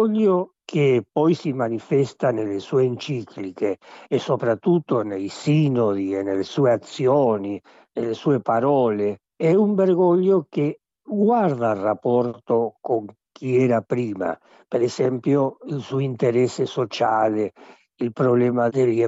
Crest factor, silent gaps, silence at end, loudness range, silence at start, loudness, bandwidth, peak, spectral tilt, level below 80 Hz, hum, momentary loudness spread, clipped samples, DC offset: 12 dB; none; 0 s; 3 LU; 0 s; -22 LUFS; 8 kHz; -8 dBFS; -7.5 dB/octave; -72 dBFS; none; 10 LU; under 0.1%; under 0.1%